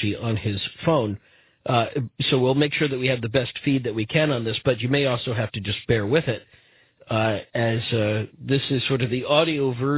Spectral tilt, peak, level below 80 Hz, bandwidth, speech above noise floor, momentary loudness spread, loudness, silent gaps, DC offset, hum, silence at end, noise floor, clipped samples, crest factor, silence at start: -10.5 dB/octave; -4 dBFS; -50 dBFS; 4 kHz; 31 dB; 7 LU; -23 LUFS; none; under 0.1%; none; 0 s; -54 dBFS; under 0.1%; 20 dB; 0 s